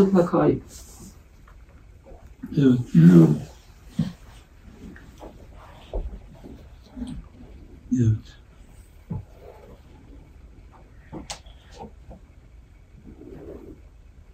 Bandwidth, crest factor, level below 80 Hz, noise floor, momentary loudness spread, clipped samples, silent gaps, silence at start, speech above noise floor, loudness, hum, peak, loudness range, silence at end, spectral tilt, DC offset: 9.2 kHz; 24 dB; -44 dBFS; -49 dBFS; 29 LU; under 0.1%; none; 0 s; 31 dB; -20 LUFS; none; -2 dBFS; 23 LU; 0.6 s; -8.5 dB/octave; under 0.1%